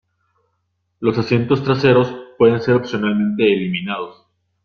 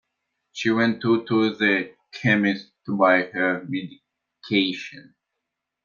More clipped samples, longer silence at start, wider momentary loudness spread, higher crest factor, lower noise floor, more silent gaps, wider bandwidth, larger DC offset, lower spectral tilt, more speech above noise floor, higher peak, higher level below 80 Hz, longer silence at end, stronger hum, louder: neither; first, 1 s vs 0.55 s; second, 10 LU vs 14 LU; about the same, 16 dB vs 20 dB; second, -70 dBFS vs -82 dBFS; neither; about the same, 6.8 kHz vs 7.4 kHz; neither; first, -8 dB/octave vs -6 dB/octave; second, 54 dB vs 60 dB; about the same, -2 dBFS vs -4 dBFS; first, -54 dBFS vs -70 dBFS; second, 0.55 s vs 0.85 s; neither; first, -17 LUFS vs -22 LUFS